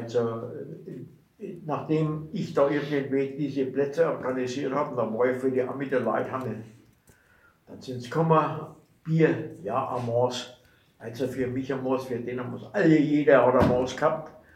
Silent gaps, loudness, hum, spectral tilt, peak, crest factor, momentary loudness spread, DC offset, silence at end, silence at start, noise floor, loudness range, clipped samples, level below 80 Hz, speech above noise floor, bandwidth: none; -26 LUFS; none; -7 dB/octave; -6 dBFS; 20 dB; 18 LU; under 0.1%; 0.2 s; 0 s; -61 dBFS; 6 LU; under 0.1%; -58 dBFS; 35 dB; 13 kHz